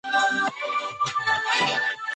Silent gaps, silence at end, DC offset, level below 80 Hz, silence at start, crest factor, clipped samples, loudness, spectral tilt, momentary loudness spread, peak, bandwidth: none; 0 s; under 0.1%; -70 dBFS; 0.05 s; 14 dB; under 0.1%; -23 LUFS; -1.5 dB/octave; 5 LU; -10 dBFS; 9.4 kHz